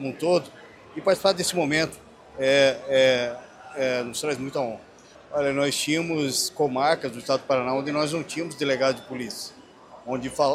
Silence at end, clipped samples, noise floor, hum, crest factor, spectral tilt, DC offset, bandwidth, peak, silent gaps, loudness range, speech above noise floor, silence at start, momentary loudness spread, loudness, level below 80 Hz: 0 s; under 0.1%; -48 dBFS; none; 20 dB; -3.5 dB/octave; under 0.1%; 15.5 kHz; -6 dBFS; none; 4 LU; 23 dB; 0 s; 13 LU; -24 LUFS; -62 dBFS